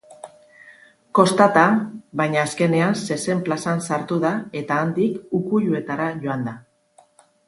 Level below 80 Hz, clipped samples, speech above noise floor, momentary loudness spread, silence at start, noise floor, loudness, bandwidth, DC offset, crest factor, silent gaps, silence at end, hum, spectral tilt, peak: -64 dBFS; under 0.1%; 37 dB; 11 LU; 0.1 s; -56 dBFS; -21 LUFS; 11.5 kHz; under 0.1%; 22 dB; none; 0.85 s; none; -6 dB/octave; 0 dBFS